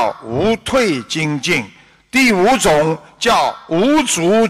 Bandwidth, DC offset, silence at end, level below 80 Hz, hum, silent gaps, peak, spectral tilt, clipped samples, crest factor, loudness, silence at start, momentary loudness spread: 15.5 kHz; under 0.1%; 0 s; -44 dBFS; none; none; -6 dBFS; -4 dB/octave; under 0.1%; 8 dB; -15 LUFS; 0 s; 7 LU